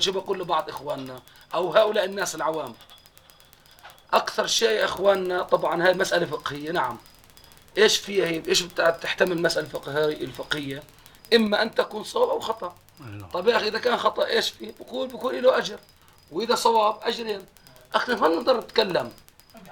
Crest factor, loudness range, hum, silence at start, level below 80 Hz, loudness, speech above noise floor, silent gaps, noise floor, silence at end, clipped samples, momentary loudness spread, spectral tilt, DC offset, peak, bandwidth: 20 dB; 3 LU; none; 0 s; -60 dBFS; -24 LUFS; 29 dB; none; -53 dBFS; 0 s; under 0.1%; 13 LU; -3 dB/octave; under 0.1%; -4 dBFS; 19 kHz